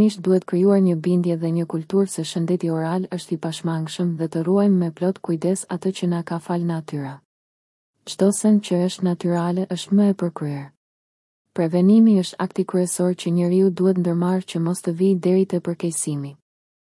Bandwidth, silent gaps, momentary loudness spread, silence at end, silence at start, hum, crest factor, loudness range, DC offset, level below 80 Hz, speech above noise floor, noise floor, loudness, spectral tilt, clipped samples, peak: 12 kHz; 7.25-7.94 s, 10.77-11.45 s; 9 LU; 0.45 s; 0 s; none; 14 dB; 4 LU; under 0.1%; -70 dBFS; over 70 dB; under -90 dBFS; -21 LUFS; -6.5 dB/octave; under 0.1%; -6 dBFS